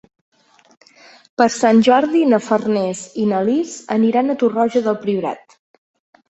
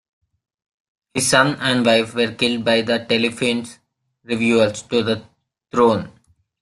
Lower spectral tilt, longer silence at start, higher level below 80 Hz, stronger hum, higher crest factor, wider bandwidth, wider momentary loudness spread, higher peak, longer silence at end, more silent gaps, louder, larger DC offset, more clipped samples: first, -5.5 dB/octave vs -4 dB/octave; first, 1.4 s vs 1.15 s; about the same, -62 dBFS vs -58 dBFS; neither; about the same, 16 dB vs 20 dB; second, 8.2 kHz vs 12.5 kHz; about the same, 9 LU vs 11 LU; about the same, -2 dBFS vs 0 dBFS; first, 0.9 s vs 0.5 s; neither; about the same, -17 LUFS vs -18 LUFS; neither; neither